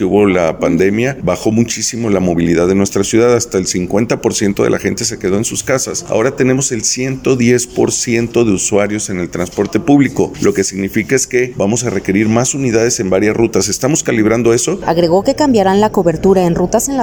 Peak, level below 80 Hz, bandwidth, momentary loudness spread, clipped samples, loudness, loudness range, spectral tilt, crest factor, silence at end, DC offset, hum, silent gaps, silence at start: 0 dBFS; -38 dBFS; over 20 kHz; 5 LU; under 0.1%; -13 LUFS; 2 LU; -4.5 dB/octave; 12 dB; 0 s; under 0.1%; none; none; 0 s